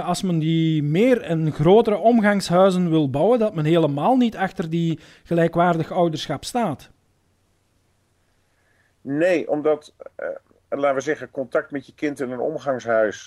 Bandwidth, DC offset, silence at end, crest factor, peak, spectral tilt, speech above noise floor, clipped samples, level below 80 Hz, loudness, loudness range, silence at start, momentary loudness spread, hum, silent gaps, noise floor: 13.5 kHz; under 0.1%; 0 s; 16 dB; -4 dBFS; -6.5 dB/octave; 44 dB; under 0.1%; -56 dBFS; -20 LUFS; 9 LU; 0 s; 12 LU; none; none; -64 dBFS